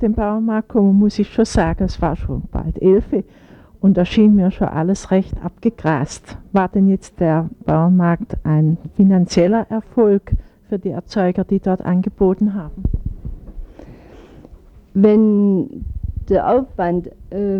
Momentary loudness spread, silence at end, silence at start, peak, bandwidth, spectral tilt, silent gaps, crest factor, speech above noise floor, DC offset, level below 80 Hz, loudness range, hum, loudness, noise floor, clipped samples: 13 LU; 0 s; 0 s; -2 dBFS; 9.4 kHz; -8 dB/octave; none; 14 dB; 26 dB; under 0.1%; -32 dBFS; 4 LU; none; -17 LUFS; -42 dBFS; under 0.1%